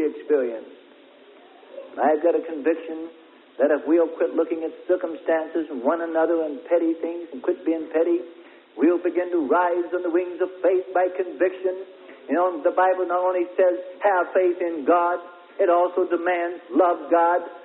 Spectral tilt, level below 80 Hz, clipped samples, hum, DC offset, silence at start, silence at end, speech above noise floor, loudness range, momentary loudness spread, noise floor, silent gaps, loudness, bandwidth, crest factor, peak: -9 dB/octave; -76 dBFS; under 0.1%; none; under 0.1%; 0 s; 0 s; 28 dB; 3 LU; 9 LU; -50 dBFS; none; -23 LUFS; 4 kHz; 16 dB; -6 dBFS